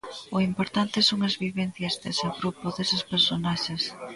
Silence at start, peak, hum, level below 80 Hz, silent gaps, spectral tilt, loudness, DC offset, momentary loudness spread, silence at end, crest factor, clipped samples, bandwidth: 0.05 s; -8 dBFS; none; -58 dBFS; none; -4.5 dB/octave; -26 LUFS; under 0.1%; 8 LU; 0 s; 20 dB; under 0.1%; 11.5 kHz